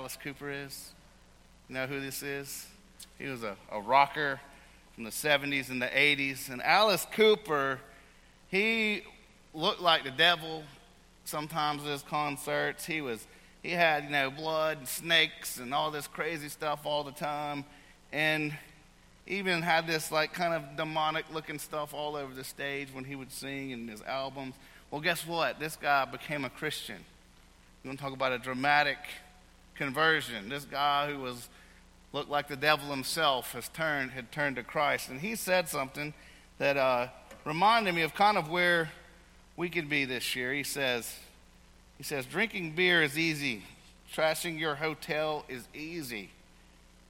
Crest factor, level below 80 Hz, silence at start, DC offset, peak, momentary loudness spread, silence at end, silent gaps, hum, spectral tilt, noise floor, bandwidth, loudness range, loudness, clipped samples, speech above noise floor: 24 dB; -62 dBFS; 0 s; under 0.1%; -8 dBFS; 16 LU; 0.8 s; none; none; -3.5 dB/octave; -59 dBFS; 16.5 kHz; 6 LU; -31 LUFS; under 0.1%; 27 dB